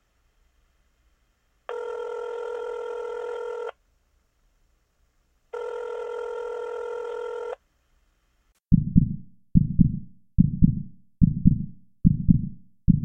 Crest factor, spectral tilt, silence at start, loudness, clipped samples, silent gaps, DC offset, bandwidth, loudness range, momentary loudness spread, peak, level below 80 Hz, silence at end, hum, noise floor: 22 dB; -10.5 dB/octave; 0 s; -26 LUFS; under 0.1%; none; under 0.1%; 6.2 kHz; 13 LU; 16 LU; -4 dBFS; -36 dBFS; 0 s; none; -68 dBFS